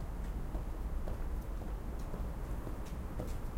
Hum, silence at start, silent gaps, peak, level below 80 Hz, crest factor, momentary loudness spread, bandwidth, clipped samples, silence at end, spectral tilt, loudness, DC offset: none; 0 s; none; -26 dBFS; -40 dBFS; 12 dB; 2 LU; 16 kHz; under 0.1%; 0 s; -7 dB/octave; -43 LUFS; under 0.1%